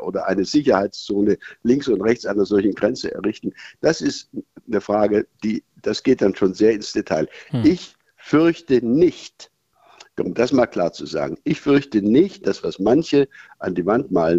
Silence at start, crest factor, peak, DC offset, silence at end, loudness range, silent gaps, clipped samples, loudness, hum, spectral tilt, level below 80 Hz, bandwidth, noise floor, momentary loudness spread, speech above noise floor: 0 s; 18 dB; -2 dBFS; under 0.1%; 0 s; 3 LU; none; under 0.1%; -20 LUFS; none; -6 dB/octave; -54 dBFS; 8 kHz; -52 dBFS; 9 LU; 32 dB